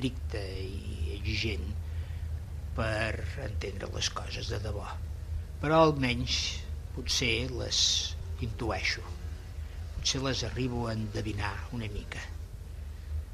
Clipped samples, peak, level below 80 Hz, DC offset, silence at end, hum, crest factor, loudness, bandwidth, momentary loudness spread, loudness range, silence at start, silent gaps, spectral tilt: under 0.1%; -10 dBFS; -40 dBFS; under 0.1%; 0 s; none; 22 dB; -32 LUFS; 14 kHz; 14 LU; 7 LU; 0 s; none; -4 dB/octave